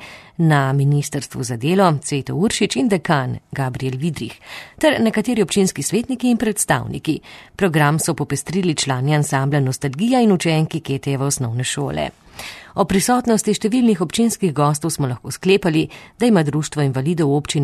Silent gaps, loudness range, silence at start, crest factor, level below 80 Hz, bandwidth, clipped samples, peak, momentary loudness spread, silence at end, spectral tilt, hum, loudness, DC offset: none; 2 LU; 0 s; 16 dB; -48 dBFS; 13 kHz; under 0.1%; -2 dBFS; 9 LU; 0 s; -5 dB/octave; none; -19 LUFS; under 0.1%